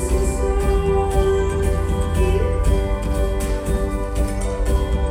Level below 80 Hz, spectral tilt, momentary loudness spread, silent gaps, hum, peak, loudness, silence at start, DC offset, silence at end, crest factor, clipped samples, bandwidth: -20 dBFS; -6.5 dB/octave; 5 LU; none; none; -4 dBFS; -21 LUFS; 0 s; under 0.1%; 0 s; 14 dB; under 0.1%; 16 kHz